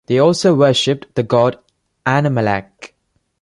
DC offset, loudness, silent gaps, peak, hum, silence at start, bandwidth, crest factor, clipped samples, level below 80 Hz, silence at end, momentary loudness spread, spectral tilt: under 0.1%; -15 LUFS; none; 0 dBFS; none; 0.1 s; 11.5 kHz; 16 dB; under 0.1%; -52 dBFS; 0.55 s; 8 LU; -5.5 dB/octave